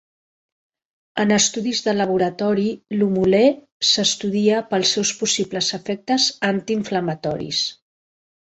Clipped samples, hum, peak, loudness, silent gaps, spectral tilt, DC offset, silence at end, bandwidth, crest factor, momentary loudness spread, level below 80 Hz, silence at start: under 0.1%; none; -4 dBFS; -19 LUFS; 3.72-3.80 s; -3.5 dB/octave; under 0.1%; 0.75 s; 8.2 kHz; 16 dB; 7 LU; -58 dBFS; 1.15 s